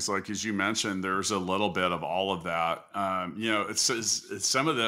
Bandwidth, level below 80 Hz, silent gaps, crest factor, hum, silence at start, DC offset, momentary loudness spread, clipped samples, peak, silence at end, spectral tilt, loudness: 16 kHz; -66 dBFS; none; 18 dB; none; 0 s; under 0.1%; 5 LU; under 0.1%; -12 dBFS; 0 s; -2.5 dB/octave; -28 LUFS